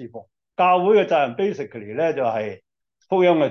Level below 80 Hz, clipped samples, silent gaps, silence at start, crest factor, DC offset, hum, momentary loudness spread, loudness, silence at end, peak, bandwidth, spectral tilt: -70 dBFS; under 0.1%; none; 0 s; 14 dB; under 0.1%; none; 15 LU; -20 LUFS; 0 s; -6 dBFS; 6.6 kHz; -7 dB/octave